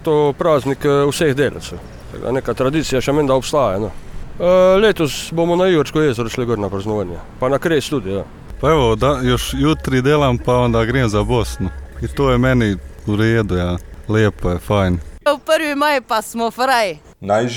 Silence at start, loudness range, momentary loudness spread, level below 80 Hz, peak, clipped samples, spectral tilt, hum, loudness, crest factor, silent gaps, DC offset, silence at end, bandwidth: 0 s; 2 LU; 11 LU; -32 dBFS; -2 dBFS; under 0.1%; -6 dB/octave; none; -17 LUFS; 14 dB; none; under 0.1%; 0 s; 18.5 kHz